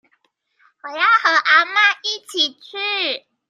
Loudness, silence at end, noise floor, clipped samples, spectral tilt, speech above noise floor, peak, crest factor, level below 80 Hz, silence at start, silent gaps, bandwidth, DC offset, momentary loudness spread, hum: -16 LUFS; 0.3 s; -65 dBFS; under 0.1%; 1 dB/octave; 47 dB; -2 dBFS; 18 dB; -86 dBFS; 0.85 s; none; 13.5 kHz; under 0.1%; 11 LU; none